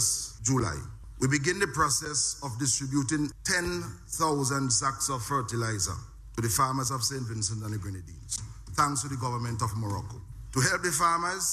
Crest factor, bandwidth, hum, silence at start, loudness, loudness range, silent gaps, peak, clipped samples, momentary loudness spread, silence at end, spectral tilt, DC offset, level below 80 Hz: 20 dB; 15.5 kHz; none; 0 s; -28 LUFS; 3 LU; none; -10 dBFS; under 0.1%; 11 LU; 0 s; -3.5 dB/octave; under 0.1%; -48 dBFS